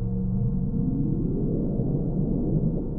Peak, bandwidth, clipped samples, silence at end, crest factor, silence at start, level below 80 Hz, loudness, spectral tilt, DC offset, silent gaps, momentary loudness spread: -12 dBFS; 1.5 kHz; under 0.1%; 0 s; 12 dB; 0 s; -32 dBFS; -26 LUFS; -15.5 dB/octave; under 0.1%; none; 1 LU